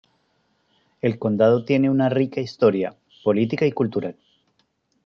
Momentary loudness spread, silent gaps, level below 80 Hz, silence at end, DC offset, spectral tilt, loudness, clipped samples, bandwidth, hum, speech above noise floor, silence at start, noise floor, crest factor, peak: 9 LU; none; -66 dBFS; 0.95 s; under 0.1%; -8.5 dB/octave; -21 LUFS; under 0.1%; 6.8 kHz; none; 48 dB; 1.05 s; -68 dBFS; 18 dB; -4 dBFS